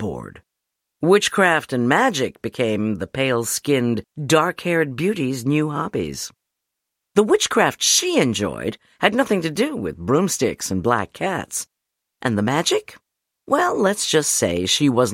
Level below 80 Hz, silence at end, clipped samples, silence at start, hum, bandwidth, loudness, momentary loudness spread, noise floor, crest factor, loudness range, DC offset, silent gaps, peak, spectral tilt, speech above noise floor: -54 dBFS; 0 s; under 0.1%; 0 s; none; 16.5 kHz; -20 LUFS; 10 LU; -81 dBFS; 20 dB; 3 LU; under 0.1%; none; 0 dBFS; -3.5 dB/octave; 61 dB